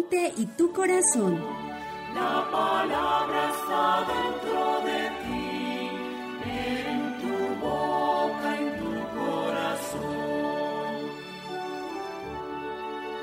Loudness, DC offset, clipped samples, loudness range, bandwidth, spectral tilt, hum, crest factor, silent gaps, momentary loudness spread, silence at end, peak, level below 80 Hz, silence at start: -28 LUFS; under 0.1%; under 0.1%; 5 LU; 16 kHz; -3.5 dB/octave; none; 16 dB; none; 10 LU; 0 s; -12 dBFS; -58 dBFS; 0 s